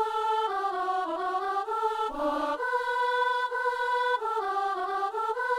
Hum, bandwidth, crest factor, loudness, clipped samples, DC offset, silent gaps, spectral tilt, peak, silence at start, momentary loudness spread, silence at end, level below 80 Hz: none; 15.5 kHz; 12 dB; -29 LUFS; under 0.1%; under 0.1%; none; -2 dB/octave; -16 dBFS; 0 s; 3 LU; 0 s; -62 dBFS